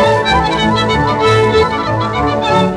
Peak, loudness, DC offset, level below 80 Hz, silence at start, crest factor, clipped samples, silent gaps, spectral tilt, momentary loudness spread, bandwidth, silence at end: -2 dBFS; -12 LUFS; under 0.1%; -30 dBFS; 0 s; 10 dB; under 0.1%; none; -5.5 dB/octave; 4 LU; 12 kHz; 0 s